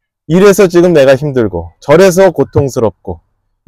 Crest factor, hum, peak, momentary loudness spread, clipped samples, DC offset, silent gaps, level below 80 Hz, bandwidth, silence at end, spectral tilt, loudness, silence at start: 8 dB; none; 0 dBFS; 15 LU; under 0.1%; under 0.1%; none; -38 dBFS; 16 kHz; 0.5 s; -6 dB/octave; -8 LUFS; 0.3 s